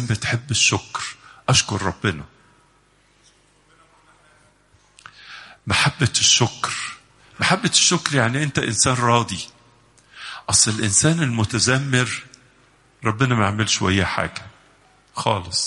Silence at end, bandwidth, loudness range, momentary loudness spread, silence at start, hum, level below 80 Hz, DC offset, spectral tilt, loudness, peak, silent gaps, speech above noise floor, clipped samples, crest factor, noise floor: 0 s; 11.5 kHz; 7 LU; 17 LU; 0 s; 50 Hz at -50 dBFS; -50 dBFS; under 0.1%; -3 dB/octave; -19 LUFS; -2 dBFS; none; 38 dB; under 0.1%; 20 dB; -58 dBFS